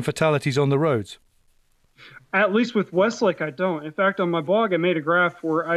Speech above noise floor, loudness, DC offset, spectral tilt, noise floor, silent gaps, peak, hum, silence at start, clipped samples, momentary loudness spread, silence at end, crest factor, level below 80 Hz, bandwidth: 40 dB; -22 LUFS; under 0.1%; -6 dB/octave; -61 dBFS; none; -8 dBFS; none; 0 s; under 0.1%; 5 LU; 0 s; 14 dB; -62 dBFS; 13.5 kHz